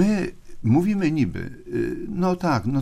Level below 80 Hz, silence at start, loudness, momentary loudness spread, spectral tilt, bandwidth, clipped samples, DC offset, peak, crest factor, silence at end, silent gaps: -44 dBFS; 0 s; -23 LUFS; 10 LU; -8 dB/octave; 14.5 kHz; under 0.1%; under 0.1%; -8 dBFS; 16 dB; 0 s; none